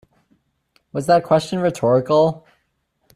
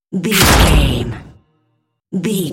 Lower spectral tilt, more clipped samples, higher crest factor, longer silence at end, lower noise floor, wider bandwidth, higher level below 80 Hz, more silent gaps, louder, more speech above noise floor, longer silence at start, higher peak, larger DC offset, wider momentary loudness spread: first, -6.5 dB/octave vs -4 dB/octave; neither; about the same, 16 dB vs 16 dB; first, 0.8 s vs 0 s; first, -69 dBFS vs -65 dBFS; second, 14.5 kHz vs 17 kHz; second, -58 dBFS vs -20 dBFS; neither; second, -18 LUFS vs -13 LUFS; about the same, 52 dB vs 53 dB; first, 0.95 s vs 0.1 s; second, -4 dBFS vs 0 dBFS; neither; second, 12 LU vs 16 LU